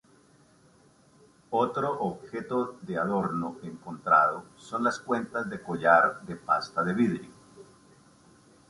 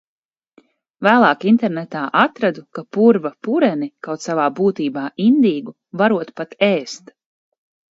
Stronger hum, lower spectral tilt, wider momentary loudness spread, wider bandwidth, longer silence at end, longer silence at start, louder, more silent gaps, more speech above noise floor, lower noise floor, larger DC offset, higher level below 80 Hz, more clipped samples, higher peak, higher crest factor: neither; about the same, -6.5 dB/octave vs -6 dB/octave; about the same, 15 LU vs 13 LU; first, 11.5 kHz vs 7.8 kHz; about the same, 1.05 s vs 1 s; first, 1.5 s vs 1 s; second, -28 LUFS vs -17 LUFS; neither; second, 32 dB vs 38 dB; first, -60 dBFS vs -55 dBFS; neither; about the same, -66 dBFS vs -66 dBFS; neither; second, -6 dBFS vs 0 dBFS; first, 24 dB vs 18 dB